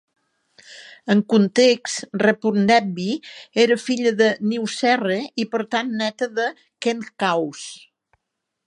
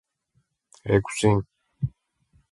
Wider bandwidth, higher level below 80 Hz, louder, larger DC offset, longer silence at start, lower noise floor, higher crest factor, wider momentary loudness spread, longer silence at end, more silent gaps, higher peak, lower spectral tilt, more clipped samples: about the same, 11.5 kHz vs 11.5 kHz; second, -70 dBFS vs -48 dBFS; first, -20 LUFS vs -25 LUFS; neither; second, 0.7 s vs 0.85 s; first, -80 dBFS vs -71 dBFS; about the same, 18 dB vs 22 dB; second, 10 LU vs 15 LU; first, 0.9 s vs 0.65 s; neither; first, -2 dBFS vs -6 dBFS; second, -4.5 dB/octave vs -6 dB/octave; neither